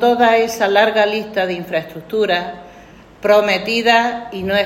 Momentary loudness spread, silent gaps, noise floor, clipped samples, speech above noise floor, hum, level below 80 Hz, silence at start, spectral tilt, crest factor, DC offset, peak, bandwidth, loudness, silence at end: 10 LU; none; -41 dBFS; under 0.1%; 26 dB; none; -52 dBFS; 0 s; -4 dB/octave; 16 dB; under 0.1%; 0 dBFS; 16.5 kHz; -16 LUFS; 0 s